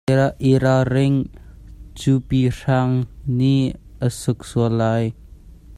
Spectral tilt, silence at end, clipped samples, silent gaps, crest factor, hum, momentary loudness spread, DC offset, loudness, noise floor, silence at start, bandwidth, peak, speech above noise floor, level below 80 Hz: -7.5 dB/octave; 0.05 s; under 0.1%; none; 16 dB; none; 8 LU; under 0.1%; -20 LUFS; -42 dBFS; 0.1 s; 12.5 kHz; -4 dBFS; 24 dB; -42 dBFS